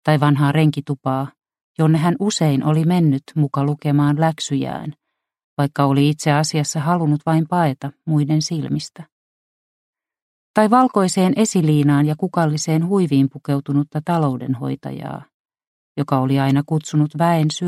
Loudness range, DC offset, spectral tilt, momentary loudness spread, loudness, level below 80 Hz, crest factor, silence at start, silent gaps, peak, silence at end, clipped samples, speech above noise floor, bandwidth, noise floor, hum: 4 LU; under 0.1%; -6.5 dB/octave; 11 LU; -18 LUFS; -58 dBFS; 18 dB; 0.05 s; 1.63-1.75 s, 5.44-5.57 s, 9.12-9.93 s, 10.22-10.54 s, 15.34-15.45 s, 15.67-15.95 s; 0 dBFS; 0 s; under 0.1%; over 73 dB; 13 kHz; under -90 dBFS; none